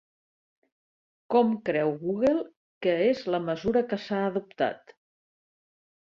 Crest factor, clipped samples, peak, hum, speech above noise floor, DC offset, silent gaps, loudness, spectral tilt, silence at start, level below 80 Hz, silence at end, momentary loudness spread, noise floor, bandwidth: 20 dB; under 0.1%; -10 dBFS; none; over 64 dB; under 0.1%; 2.57-2.81 s; -27 LUFS; -7 dB/octave; 1.3 s; -62 dBFS; 1.25 s; 6 LU; under -90 dBFS; 7.2 kHz